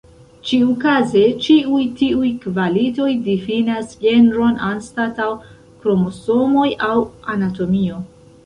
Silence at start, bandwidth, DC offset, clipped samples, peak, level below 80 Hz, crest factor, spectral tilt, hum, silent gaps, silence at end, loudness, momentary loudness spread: 0.45 s; 10 kHz; under 0.1%; under 0.1%; -2 dBFS; -48 dBFS; 14 dB; -6.5 dB/octave; none; none; 0.4 s; -17 LUFS; 10 LU